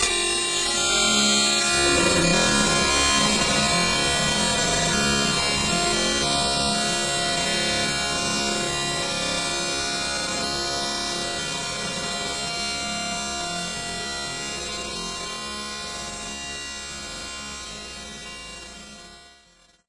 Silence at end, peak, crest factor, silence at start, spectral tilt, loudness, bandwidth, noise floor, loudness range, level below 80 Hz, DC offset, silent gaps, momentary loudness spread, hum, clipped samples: 0.6 s; -8 dBFS; 18 dB; 0 s; -2 dB/octave; -22 LUFS; 11.5 kHz; -57 dBFS; 13 LU; -44 dBFS; under 0.1%; none; 14 LU; none; under 0.1%